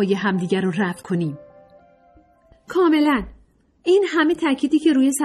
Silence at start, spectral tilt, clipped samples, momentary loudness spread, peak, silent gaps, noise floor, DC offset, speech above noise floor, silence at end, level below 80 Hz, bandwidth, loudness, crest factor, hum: 0 s; -5.5 dB/octave; under 0.1%; 10 LU; -6 dBFS; none; -54 dBFS; under 0.1%; 36 dB; 0 s; -52 dBFS; 14.5 kHz; -20 LUFS; 14 dB; none